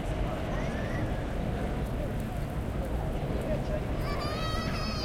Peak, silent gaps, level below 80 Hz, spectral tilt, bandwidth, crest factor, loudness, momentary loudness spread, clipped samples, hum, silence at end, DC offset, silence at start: -18 dBFS; none; -36 dBFS; -6.5 dB/octave; 16.5 kHz; 14 dB; -33 LUFS; 2 LU; under 0.1%; none; 0 s; under 0.1%; 0 s